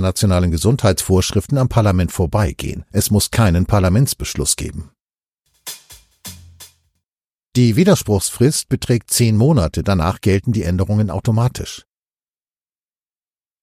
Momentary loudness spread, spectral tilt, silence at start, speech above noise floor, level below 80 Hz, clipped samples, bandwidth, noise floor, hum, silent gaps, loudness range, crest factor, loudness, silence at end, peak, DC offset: 17 LU; -5.5 dB/octave; 0 s; over 74 dB; -34 dBFS; under 0.1%; 16 kHz; under -90 dBFS; none; 5.01-5.05 s, 5.28-5.32 s, 7.24-7.38 s; 7 LU; 18 dB; -16 LUFS; 1.85 s; 0 dBFS; under 0.1%